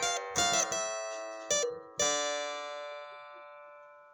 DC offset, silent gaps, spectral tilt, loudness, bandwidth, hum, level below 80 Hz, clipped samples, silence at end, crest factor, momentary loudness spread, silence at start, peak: under 0.1%; none; 0 dB/octave; -32 LUFS; 17 kHz; none; -72 dBFS; under 0.1%; 0 s; 20 dB; 21 LU; 0 s; -16 dBFS